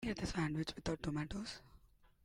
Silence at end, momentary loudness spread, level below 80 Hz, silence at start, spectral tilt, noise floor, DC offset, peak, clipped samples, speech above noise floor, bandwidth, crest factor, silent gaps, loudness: 0.5 s; 9 LU; -56 dBFS; 0 s; -5.5 dB/octave; -66 dBFS; under 0.1%; -26 dBFS; under 0.1%; 25 dB; 15.5 kHz; 18 dB; none; -42 LUFS